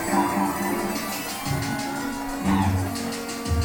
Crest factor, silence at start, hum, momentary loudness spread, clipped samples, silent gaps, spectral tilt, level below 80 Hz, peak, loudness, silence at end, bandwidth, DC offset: 16 dB; 0 s; none; 7 LU; under 0.1%; none; -5 dB/octave; -40 dBFS; -8 dBFS; -26 LUFS; 0 s; 19 kHz; under 0.1%